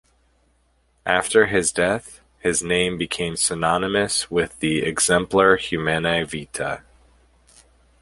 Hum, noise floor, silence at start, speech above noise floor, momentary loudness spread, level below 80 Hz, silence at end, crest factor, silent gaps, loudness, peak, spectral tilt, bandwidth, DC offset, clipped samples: none; -63 dBFS; 1.05 s; 42 dB; 11 LU; -48 dBFS; 1.25 s; 20 dB; none; -20 LUFS; -2 dBFS; -3 dB/octave; 11.5 kHz; under 0.1%; under 0.1%